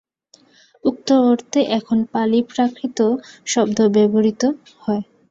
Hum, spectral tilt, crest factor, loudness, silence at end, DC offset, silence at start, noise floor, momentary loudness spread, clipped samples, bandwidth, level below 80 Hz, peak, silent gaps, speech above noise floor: none; -5 dB/octave; 14 dB; -18 LUFS; 0.25 s; under 0.1%; 0.85 s; -54 dBFS; 9 LU; under 0.1%; 7.8 kHz; -62 dBFS; -4 dBFS; none; 37 dB